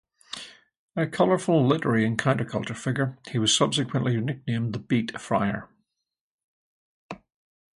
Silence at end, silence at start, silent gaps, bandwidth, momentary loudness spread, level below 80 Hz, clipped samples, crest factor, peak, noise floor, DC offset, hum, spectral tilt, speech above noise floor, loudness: 0.65 s; 0.3 s; 0.77-0.88 s, 6.20-6.38 s, 6.44-7.09 s; 11.5 kHz; 17 LU; -62 dBFS; under 0.1%; 20 dB; -8 dBFS; -75 dBFS; under 0.1%; none; -5 dB/octave; 50 dB; -25 LUFS